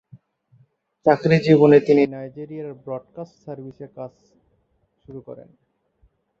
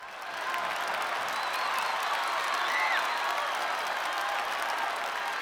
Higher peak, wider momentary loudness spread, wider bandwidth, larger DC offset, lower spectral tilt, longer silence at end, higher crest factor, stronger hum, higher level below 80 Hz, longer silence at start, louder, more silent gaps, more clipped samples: first, -2 dBFS vs -14 dBFS; first, 25 LU vs 5 LU; second, 7.4 kHz vs over 20 kHz; neither; first, -8.5 dB/octave vs 0 dB/octave; first, 1.05 s vs 0 s; about the same, 20 dB vs 18 dB; neither; first, -62 dBFS vs -74 dBFS; first, 1.05 s vs 0 s; first, -17 LUFS vs -30 LUFS; neither; neither